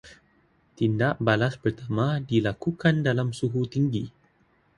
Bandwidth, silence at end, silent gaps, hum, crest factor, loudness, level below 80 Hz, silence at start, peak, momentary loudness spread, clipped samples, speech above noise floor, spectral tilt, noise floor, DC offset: 11 kHz; 0.7 s; none; none; 20 dB; -26 LUFS; -56 dBFS; 0.05 s; -6 dBFS; 5 LU; under 0.1%; 40 dB; -7.5 dB/octave; -64 dBFS; under 0.1%